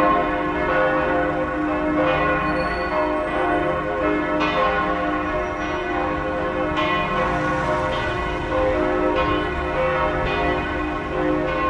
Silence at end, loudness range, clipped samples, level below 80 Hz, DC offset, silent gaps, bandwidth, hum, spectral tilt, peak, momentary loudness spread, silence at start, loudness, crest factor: 0 s; 1 LU; under 0.1%; -36 dBFS; under 0.1%; none; 10.5 kHz; none; -6.5 dB/octave; -8 dBFS; 4 LU; 0 s; -21 LUFS; 14 dB